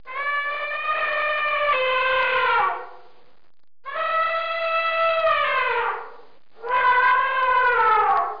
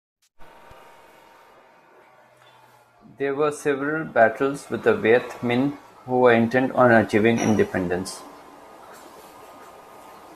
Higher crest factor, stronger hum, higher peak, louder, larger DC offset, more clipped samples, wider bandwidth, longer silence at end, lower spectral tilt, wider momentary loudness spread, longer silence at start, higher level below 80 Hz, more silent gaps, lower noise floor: second, 12 dB vs 20 dB; neither; second, -10 dBFS vs -4 dBFS; about the same, -20 LUFS vs -21 LUFS; first, 0.8% vs under 0.1%; neither; second, 5.2 kHz vs 14 kHz; about the same, 0 s vs 0 s; second, -3.5 dB/octave vs -6 dB/octave; second, 8 LU vs 11 LU; second, 0.05 s vs 0.4 s; about the same, -58 dBFS vs -62 dBFS; neither; first, -61 dBFS vs -54 dBFS